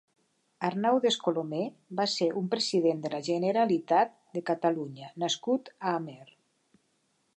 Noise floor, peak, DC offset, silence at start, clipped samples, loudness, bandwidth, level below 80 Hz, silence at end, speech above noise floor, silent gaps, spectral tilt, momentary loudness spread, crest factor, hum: -73 dBFS; -12 dBFS; under 0.1%; 0.6 s; under 0.1%; -29 LUFS; 10 kHz; -82 dBFS; 1.15 s; 45 dB; none; -4.5 dB/octave; 9 LU; 18 dB; none